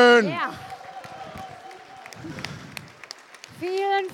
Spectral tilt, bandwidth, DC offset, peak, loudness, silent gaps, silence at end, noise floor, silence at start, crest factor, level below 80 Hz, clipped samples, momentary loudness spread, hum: -4 dB/octave; 14 kHz; under 0.1%; -6 dBFS; -24 LUFS; none; 0 s; -44 dBFS; 0 s; 20 dB; -64 dBFS; under 0.1%; 19 LU; none